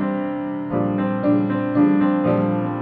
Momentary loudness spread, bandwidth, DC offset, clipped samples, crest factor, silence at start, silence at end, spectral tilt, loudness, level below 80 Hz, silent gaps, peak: 8 LU; 4.3 kHz; under 0.1%; under 0.1%; 14 dB; 0 s; 0 s; -11.5 dB/octave; -20 LUFS; -56 dBFS; none; -6 dBFS